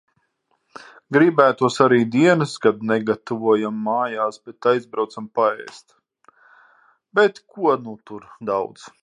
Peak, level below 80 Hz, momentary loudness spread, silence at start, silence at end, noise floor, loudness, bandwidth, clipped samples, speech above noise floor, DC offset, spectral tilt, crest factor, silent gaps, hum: 0 dBFS; -68 dBFS; 12 LU; 1.1 s; 0.15 s; -69 dBFS; -20 LUFS; 11 kHz; under 0.1%; 49 dB; under 0.1%; -6 dB/octave; 20 dB; none; none